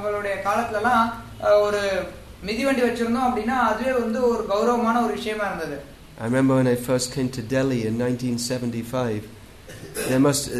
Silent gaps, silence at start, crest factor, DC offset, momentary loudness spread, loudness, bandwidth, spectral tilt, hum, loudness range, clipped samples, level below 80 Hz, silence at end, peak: none; 0 s; 16 dB; under 0.1%; 11 LU; -23 LUFS; 13.5 kHz; -5 dB/octave; none; 3 LU; under 0.1%; -48 dBFS; 0 s; -6 dBFS